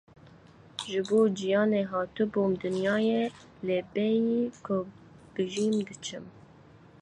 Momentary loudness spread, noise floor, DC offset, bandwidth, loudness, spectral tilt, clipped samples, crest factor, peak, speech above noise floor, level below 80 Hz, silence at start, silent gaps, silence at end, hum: 14 LU; -54 dBFS; under 0.1%; 11 kHz; -29 LUFS; -5.5 dB/octave; under 0.1%; 16 dB; -14 dBFS; 26 dB; -66 dBFS; 0.8 s; none; 0.65 s; none